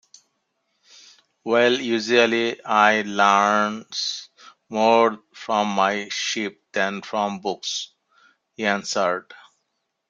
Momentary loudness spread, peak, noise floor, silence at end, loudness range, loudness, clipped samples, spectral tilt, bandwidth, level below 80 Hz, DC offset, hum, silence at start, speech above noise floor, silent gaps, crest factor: 11 LU; -2 dBFS; -76 dBFS; 0.75 s; 7 LU; -21 LUFS; under 0.1%; -3 dB/octave; 8.8 kHz; -72 dBFS; under 0.1%; none; 1.45 s; 55 dB; none; 22 dB